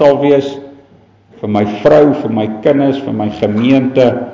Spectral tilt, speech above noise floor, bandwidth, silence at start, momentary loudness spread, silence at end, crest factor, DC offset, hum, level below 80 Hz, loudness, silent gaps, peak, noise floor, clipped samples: -8 dB/octave; 34 dB; 7.4 kHz; 0 s; 9 LU; 0 s; 12 dB; under 0.1%; none; -46 dBFS; -12 LUFS; none; 0 dBFS; -45 dBFS; under 0.1%